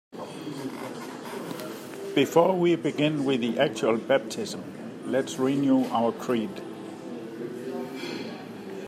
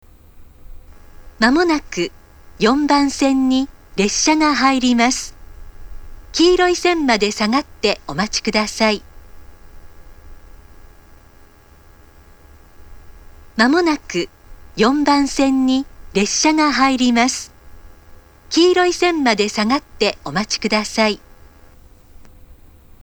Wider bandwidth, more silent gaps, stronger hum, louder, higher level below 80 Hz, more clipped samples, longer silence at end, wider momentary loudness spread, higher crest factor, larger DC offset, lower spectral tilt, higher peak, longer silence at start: second, 15.5 kHz vs over 20 kHz; neither; neither; second, -27 LUFS vs -16 LUFS; second, -76 dBFS vs -42 dBFS; neither; second, 0 s vs 0.5 s; first, 15 LU vs 10 LU; about the same, 20 dB vs 18 dB; neither; first, -5.5 dB/octave vs -3 dB/octave; second, -6 dBFS vs 0 dBFS; second, 0.1 s vs 0.35 s